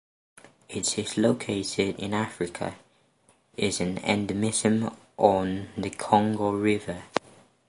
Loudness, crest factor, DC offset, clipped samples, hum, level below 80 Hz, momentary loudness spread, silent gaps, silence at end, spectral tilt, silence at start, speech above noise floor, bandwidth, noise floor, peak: -27 LUFS; 26 dB; under 0.1%; under 0.1%; none; -56 dBFS; 10 LU; none; 0.5 s; -4.5 dB/octave; 0.7 s; 38 dB; 11.5 kHz; -64 dBFS; -2 dBFS